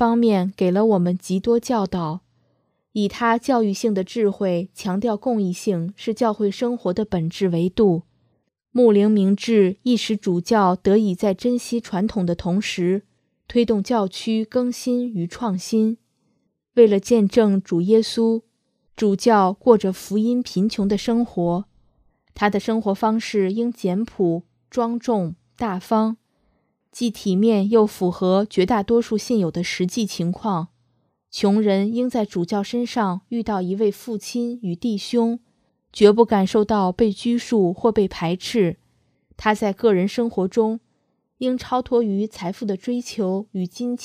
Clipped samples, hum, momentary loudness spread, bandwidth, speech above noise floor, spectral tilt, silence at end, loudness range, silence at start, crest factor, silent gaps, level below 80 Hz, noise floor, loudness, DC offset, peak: under 0.1%; none; 9 LU; 14.5 kHz; 50 dB; -6.5 dB/octave; 0 s; 4 LU; 0 s; 20 dB; none; -54 dBFS; -69 dBFS; -21 LUFS; under 0.1%; 0 dBFS